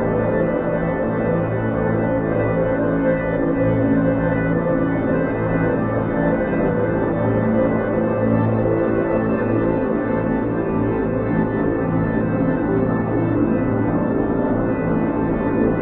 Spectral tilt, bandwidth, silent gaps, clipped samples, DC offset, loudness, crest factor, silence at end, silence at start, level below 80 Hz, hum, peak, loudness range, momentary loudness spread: -9 dB/octave; 3.9 kHz; none; under 0.1%; under 0.1%; -19 LUFS; 14 dB; 0 s; 0 s; -36 dBFS; none; -6 dBFS; 1 LU; 2 LU